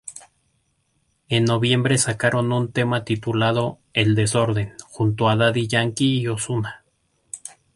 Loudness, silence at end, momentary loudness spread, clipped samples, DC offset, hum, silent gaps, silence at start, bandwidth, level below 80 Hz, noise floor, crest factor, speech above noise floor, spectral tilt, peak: -21 LUFS; 0.25 s; 13 LU; under 0.1%; under 0.1%; none; none; 0.05 s; 11.5 kHz; -52 dBFS; -68 dBFS; 18 dB; 48 dB; -5 dB/octave; -4 dBFS